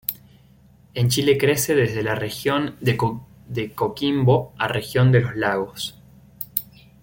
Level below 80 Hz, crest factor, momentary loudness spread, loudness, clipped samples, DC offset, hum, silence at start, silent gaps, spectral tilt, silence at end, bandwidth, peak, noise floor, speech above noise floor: -52 dBFS; 20 dB; 13 LU; -22 LUFS; under 0.1%; under 0.1%; none; 0.1 s; none; -5.5 dB/octave; 0.4 s; 17 kHz; -2 dBFS; -52 dBFS; 32 dB